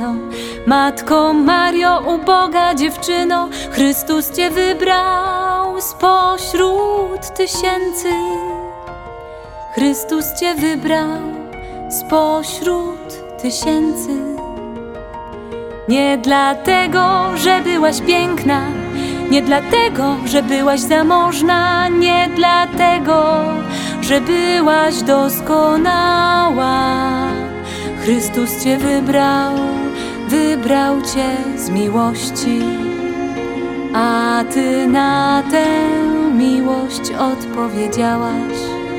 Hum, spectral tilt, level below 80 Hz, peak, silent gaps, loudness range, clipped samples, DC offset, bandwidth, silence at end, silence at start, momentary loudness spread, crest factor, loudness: none; -4 dB/octave; -42 dBFS; 0 dBFS; none; 6 LU; under 0.1%; under 0.1%; 18.5 kHz; 0 s; 0 s; 11 LU; 14 dB; -15 LUFS